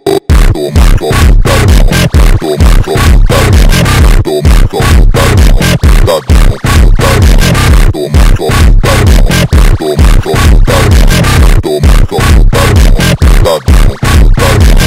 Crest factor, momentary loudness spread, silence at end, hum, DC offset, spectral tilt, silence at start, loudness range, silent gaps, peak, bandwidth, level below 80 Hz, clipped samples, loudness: 4 dB; 2 LU; 0 s; none; 1%; -5.5 dB/octave; 0.05 s; 1 LU; none; 0 dBFS; 16 kHz; -6 dBFS; 10%; -7 LUFS